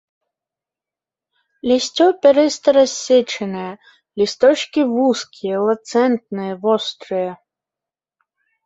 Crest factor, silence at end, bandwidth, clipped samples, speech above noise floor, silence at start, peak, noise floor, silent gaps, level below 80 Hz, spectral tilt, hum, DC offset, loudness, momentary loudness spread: 16 dB; 1.3 s; 8 kHz; under 0.1%; 72 dB; 1.65 s; -2 dBFS; -89 dBFS; none; -64 dBFS; -4 dB/octave; none; under 0.1%; -17 LUFS; 13 LU